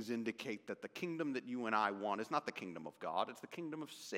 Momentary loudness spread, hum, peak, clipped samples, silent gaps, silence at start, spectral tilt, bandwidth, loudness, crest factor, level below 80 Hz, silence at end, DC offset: 11 LU; none; -20 dBFS; under 0.1%; none; 0 s; -4.5 dB/octave; 16.5 kHz; -42 LUFS; 22 dB; under -90 dBFS; 0 s; under 0.1%